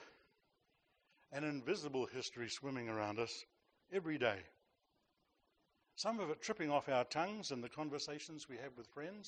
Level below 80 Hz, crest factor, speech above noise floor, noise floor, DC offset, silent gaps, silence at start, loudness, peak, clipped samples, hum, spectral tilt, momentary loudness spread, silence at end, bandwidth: -82 dBFS; 24 dB; 39 dB; -82 dBFS; under 0.1%; none; 0 s; -43 LUFS; -20 dBFS; under 0.1%; none; -4 dB/octave; 12 LU; 0 s; 9.4 kHz